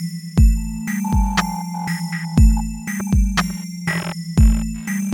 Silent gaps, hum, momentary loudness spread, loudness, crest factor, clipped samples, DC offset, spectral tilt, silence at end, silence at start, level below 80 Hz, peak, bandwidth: none; none; 9 LU; -20 LUFS; 16 dB; under 0.1%; under 0.1%; -5.5 dB/octave; 0 s; 0 s; -20 dBFS; -2 dBFS; 17.5 kHz